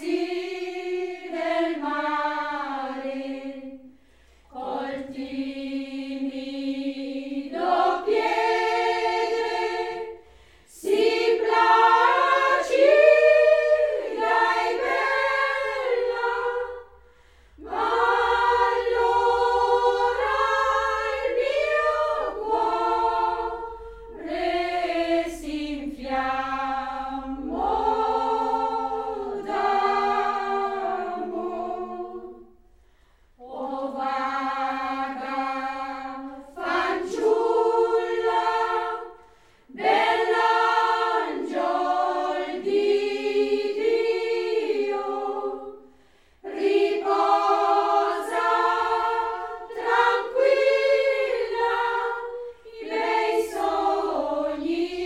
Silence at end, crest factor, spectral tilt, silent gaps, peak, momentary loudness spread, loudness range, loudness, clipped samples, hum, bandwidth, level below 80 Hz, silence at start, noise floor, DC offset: 0 s; 20 dB; -3.5 dB/octave; none; -4 dBFS; 12 LU; 10 LU; -24 LUFS; under 0.1%; none; 13.5 kHz; -54 dBFS; 0 s; -59 dBFS; 0.1%